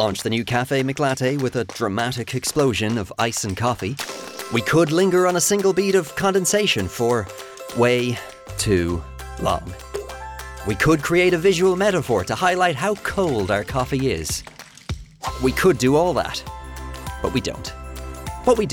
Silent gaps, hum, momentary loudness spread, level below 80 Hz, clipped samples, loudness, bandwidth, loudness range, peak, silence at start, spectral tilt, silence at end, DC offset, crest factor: none; none; 16 LU; -40 dBFS; under 0.1%; -21 LUFS; 18.5 kHz; 4 LU; -8 dBFS; 0 s; -4.5 dB/octave; 0 s; under 0.1%; 14 dB